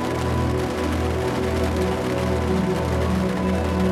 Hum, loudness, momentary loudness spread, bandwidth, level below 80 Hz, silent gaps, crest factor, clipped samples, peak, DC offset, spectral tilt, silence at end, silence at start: none; -23 LUFS; 2 LU; 14.5 kHz; -32 dBFS; none; 12 dB; under 0.1%; -8 dBFS; under 0.1%; -6.5 dB/octave; 0 s; 0 s